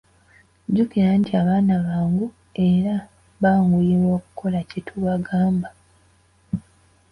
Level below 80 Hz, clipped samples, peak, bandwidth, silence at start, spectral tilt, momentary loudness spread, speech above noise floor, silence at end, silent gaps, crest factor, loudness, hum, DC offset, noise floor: -50 dBFS; under 0.1%; -6 dBFS; 5.4 kHz; 0.7 s; -9.5 dB/octave; 13 LU; 38 dB; 0.5 s; none; 14 dB; -21 LUFS; none; under 0.1%; -58 dBFS